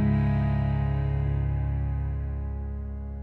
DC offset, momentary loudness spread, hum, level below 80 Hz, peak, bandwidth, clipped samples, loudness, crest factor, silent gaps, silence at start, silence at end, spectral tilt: under 0.1%; 10 LU; none; -32 dBFS; -14 dBFS; 4.3 kHz; under 0.1%; -28 LUFS; 12 dB; none; 0 s; 0 s; -11 dB/octave